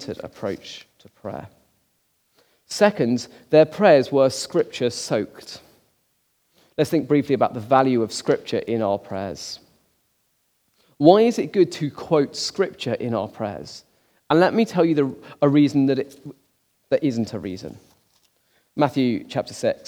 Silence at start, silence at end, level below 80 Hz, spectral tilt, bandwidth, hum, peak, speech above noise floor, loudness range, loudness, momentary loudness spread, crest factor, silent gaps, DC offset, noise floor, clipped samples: 0 s; 0.15 s; -66 dBFS; -6 dB/octave; 17.5 kHz; none; 0 dBFS; 47 dB; 6 LU; -21 LUFS; 18 LU; 22 dB; none; under 0.1%; -68 dBFS; under 0.1%